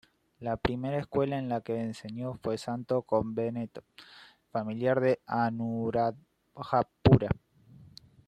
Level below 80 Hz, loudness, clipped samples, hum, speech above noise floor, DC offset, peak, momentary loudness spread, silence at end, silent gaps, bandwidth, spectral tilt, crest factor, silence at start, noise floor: -52 dBFS; -30 LUFS; under 0.1%; none; 26 dB; under 0.1%; -8 dBFS; 12 LU; 0.4 s; none; 10 kHz; -8 dB/octave; 22 dB; 0.4 s; -56 dBFS